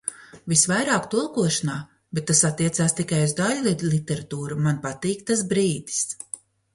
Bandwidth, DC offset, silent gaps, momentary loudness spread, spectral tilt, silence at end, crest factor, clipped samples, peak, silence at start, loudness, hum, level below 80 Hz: 11.5 kHz; under 0.1%; none; 12 LU; -4 dB/octave; 0.4 s; 20 dB; under 0.1%; -4 dBFS; 0.05 s; -23 LUFS; none; -58 dBFS